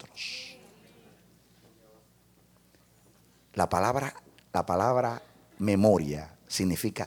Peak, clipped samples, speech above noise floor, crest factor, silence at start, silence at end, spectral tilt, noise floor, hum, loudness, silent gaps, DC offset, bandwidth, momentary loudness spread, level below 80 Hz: -10 dBFS; under 0.1%; 35 dB; 22 dB; 0.05 s; 0 s; -5.5 dB/octave; -62 dBFS; none; -29 LUFS; none; under 0.1%; 19.5 kHz; 15 LU; -58 dBFS